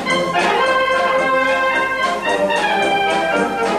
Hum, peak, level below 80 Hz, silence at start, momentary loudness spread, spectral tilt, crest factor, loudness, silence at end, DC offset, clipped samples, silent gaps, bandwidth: none; -4 dBFS; -50 dBFS; 0 s; 3 LU; -3.5 dB/octave; 12 dB; -16 LUFS; 0 s; under 0.1%; under 0.1%; none; 13.5 kHz